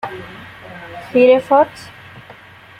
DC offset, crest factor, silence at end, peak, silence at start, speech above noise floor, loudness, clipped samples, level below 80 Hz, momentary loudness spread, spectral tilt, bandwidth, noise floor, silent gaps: under 0.1%; 16 dB; 1.1 s; -2 dBFS; 0.05 s; 27 dB; -13 LUFS; under 0.1%; -56 dBFS; 24 LU; -6 dB/octave; 10.5 kHz; -41 dBFS; none